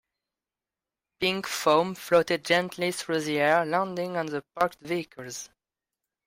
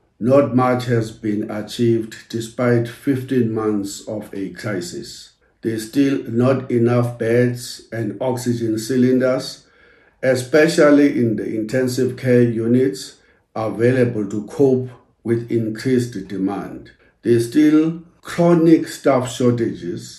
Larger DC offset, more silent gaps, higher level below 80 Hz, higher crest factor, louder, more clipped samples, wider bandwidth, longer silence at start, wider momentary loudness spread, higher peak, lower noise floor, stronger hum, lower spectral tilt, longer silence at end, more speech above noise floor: neither; neither; second, -68 dBFS vs -56 dBFS; about the same, 20 dB vs 18 dB; second, -26 LUFS vs -18 LUFS; neither; first, 16 kHz vs 13 kHz; first, 1.2 s vs 0.2 s; about the same, 12 LU vs 14 LU; second, -8 dBFS vs 0 dBFS; first, under -90 dBFS vs -52 dBFS; neither; second, -4 dB/octave vs -6.5 dB/octave; first, 0.8 s vs 0 s; first, over 63 dB vs 34 dB